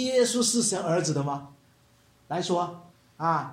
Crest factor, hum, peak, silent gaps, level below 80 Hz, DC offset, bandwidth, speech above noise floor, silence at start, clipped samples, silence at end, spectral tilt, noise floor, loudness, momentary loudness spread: 16 dB; none; -12 dBFS; none; -70 dBFS; under 0.1%; 16 kHz; 35 dB; 0 s; under 0.1%; 0 s; -4 dB/octave; -61 dBFS; -27 LUFS; 11 LU